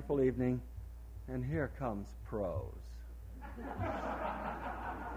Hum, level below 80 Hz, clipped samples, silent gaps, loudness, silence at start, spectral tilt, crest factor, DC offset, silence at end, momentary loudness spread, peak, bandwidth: none; -48 dBFS; under 0.1%; none; -39 LUFS; 0 s; -8.5 dB/octave; 18 dB; under 0.1%; 0 s; 16 LU; -22 dBFS; 16 kHz